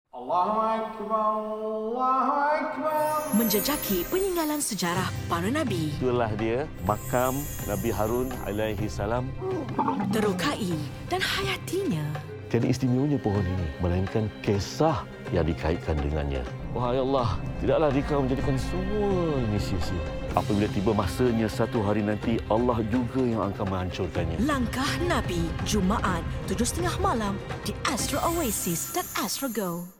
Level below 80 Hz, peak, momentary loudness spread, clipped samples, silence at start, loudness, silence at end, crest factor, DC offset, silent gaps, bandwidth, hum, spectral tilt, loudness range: -40 dBFS; -6 dBFS; 5 LU; under 0.1%; 0.15 s; -27 LUFS; 0.1 s; 20 dB; under 0.1%; none; 17 kHz; none; -5.5 dB/octave; 2 LU